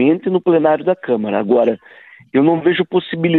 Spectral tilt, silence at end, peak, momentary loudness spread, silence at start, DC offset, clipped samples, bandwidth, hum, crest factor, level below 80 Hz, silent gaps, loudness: -10 dB/octave; 0 s; -2 dBFS; 5 LU; 0 s; under 0.1%; under 0.1%; 4.2 kHz; none; 14 dB; -60 dBFS; none; -16 LUFS